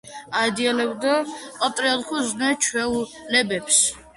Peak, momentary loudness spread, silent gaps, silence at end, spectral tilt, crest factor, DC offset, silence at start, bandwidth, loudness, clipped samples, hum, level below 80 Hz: -4 dBFS; 8 LU; none; 0.1 s; -1.5 dB/octave; 20 dB; under 0.1%; 0.05 s; 11.5 kHz; -21 LUFS; under 0.1%; none; -58 dBFS